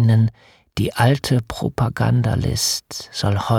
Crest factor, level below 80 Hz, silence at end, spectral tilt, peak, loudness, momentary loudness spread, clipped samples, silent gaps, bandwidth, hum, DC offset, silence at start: 14 dB; -42 dBFS; 0 s; -5 dB/octave; -4 dBFS; -20 LUFS; 8 LU; under 0.1%; none; 16 kHz; none; under 0.1%; 0 s